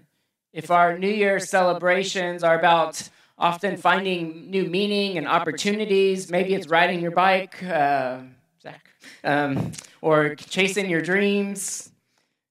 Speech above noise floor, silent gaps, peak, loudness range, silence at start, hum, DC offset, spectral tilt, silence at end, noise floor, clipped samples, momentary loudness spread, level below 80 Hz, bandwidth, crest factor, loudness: 49 dB; none; -2 dBFS; 3 LU; 0.55 s; none; under 0.1%; -4.5 dB/octave; 0.65 s; -71 dBFS; under 0.1%; 9 LU; -70 dBFS; 15 kHz; 20 dB; -22 LUFS